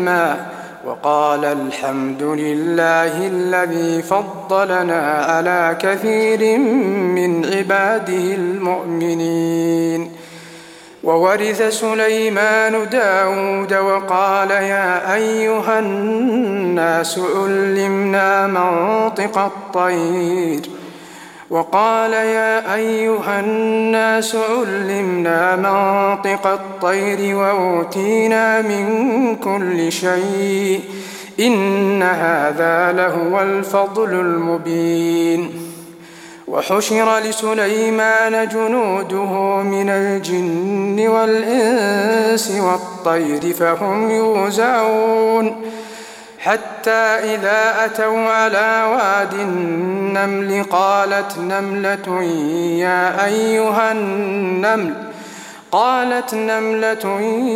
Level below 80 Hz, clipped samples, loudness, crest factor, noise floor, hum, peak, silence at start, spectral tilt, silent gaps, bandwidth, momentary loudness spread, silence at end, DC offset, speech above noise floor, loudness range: -68 dBFS; under 0.1%; -16 LUFS; 16 dB; -39 dBFS; none; 0 dBFS; 0 s; -4.5 dB/octave; none; 16.5 kHz; 6 LU; 0 s; under 0.1%; 23 dB; 2 LU